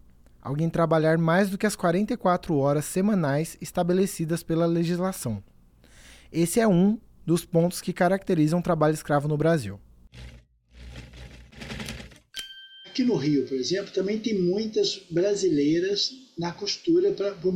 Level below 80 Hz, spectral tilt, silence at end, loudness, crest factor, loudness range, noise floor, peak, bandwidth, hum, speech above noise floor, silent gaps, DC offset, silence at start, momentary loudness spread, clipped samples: -52 dBFS; -6 dB/octave; 0 s; -25 LUFS; 14 dB; 7 LU; -54 dBFS; -10 dBFS; 17 kHz; none; 30 dB; none; under 0.1%; 0.45 s; 15 LU; under 0.1%